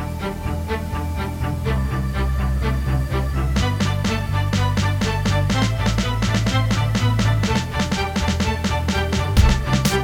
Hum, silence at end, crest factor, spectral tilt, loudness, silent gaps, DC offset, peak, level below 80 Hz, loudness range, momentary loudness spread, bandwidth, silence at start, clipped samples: none; 0 s; 18 dB; -5.5 dB/octave; -21 LUFS; none; under 0.1%; -2 dBFS; -26 dBFS; 3 LU; 6 LU; 18 kHz; 0 s; under 0.1%